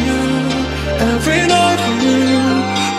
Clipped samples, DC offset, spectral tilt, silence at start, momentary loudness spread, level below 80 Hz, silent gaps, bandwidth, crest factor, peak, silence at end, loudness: under 0.1%; under 0.1%; -4.5 dB/octave; 0 s; 5 LU; -30 dBFS; none; 14 kHz; 14 dB; 0 dBFS; 0 s; -14 LUFS